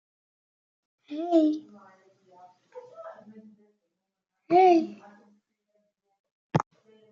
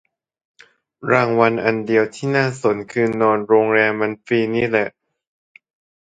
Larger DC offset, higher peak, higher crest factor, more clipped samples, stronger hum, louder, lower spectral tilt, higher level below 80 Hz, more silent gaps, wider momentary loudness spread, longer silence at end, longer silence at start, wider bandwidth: neither; second, -10 dBFS vs 0 dBFS; about the same, 20 dB vs 18 dB; neither; neither; second, -25 LUFS vs -18 LUFS; about the same, -6.5 dB/octave vs -6.5 dB/octave; second, -74 dBFS vs -60 dBFS; first, 6.19-6.24 s, 6.31-6.50 s vs none; first, 26 LU vs 6 LU; second, 0.5 s vs 1.15 s; about the same, 1.1 s vs 1 s; second, 7.2 kHz vs 9.2 kHz